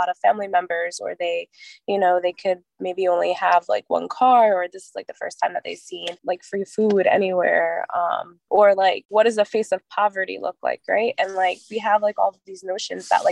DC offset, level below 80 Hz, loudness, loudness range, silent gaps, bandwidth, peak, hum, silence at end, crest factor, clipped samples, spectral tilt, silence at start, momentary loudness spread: under 0.1%; -76 dBFS; -21 LUFS; 3 LU; 9.05-9.09 s; 11.5 kHz; -4 dBFS; none; 0 s; 18 dB; under 0.1%; -4 dB/octave; 0 s; 13 LU